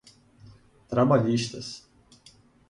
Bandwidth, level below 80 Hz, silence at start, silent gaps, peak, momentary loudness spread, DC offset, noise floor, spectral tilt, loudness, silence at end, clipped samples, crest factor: 11.5 kHz; -60 dBFS; 0.9 s; none; -8 dBFS; 18 LU; under 0.1%; -57 dBFS; -6.5 dB/octave; -25 LUFS; 0.9 s; under 0.1%; 20 dB